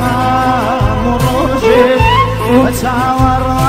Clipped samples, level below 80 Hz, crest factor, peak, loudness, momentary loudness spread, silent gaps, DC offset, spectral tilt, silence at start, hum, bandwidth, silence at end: under 0.1%; -22 dBFS; 10 dB; 0 dBFS; -11 LUFS; 4 LU; none; under 0.1%; -6 dB/octave; 0 s; none; 16 kHz; 0 s